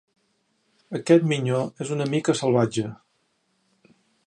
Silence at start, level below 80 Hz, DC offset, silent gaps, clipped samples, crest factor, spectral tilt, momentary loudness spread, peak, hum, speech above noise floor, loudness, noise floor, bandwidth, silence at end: 0.9 s; -68 dBFS; under 0.1%; none; under 0.1%; 20 dB; -6 dB/octave; 13 LU; -4 dBFS; none; 48 dB; -23 LUFS; -70 dBFS; 10.5 kHz; 1.35 s